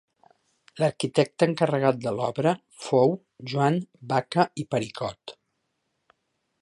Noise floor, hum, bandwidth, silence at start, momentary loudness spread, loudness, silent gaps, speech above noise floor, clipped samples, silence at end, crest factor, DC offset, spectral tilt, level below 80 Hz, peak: -77 dBFS; none; 11.5 kHz; 0.75 s; 10 LU; -25 LUFS; none; 52 dB; under 0.1%; 1.3 s; 20 dB; under 0.1%; -6.5 dB/octave; -68 dBFS; -6 dBFS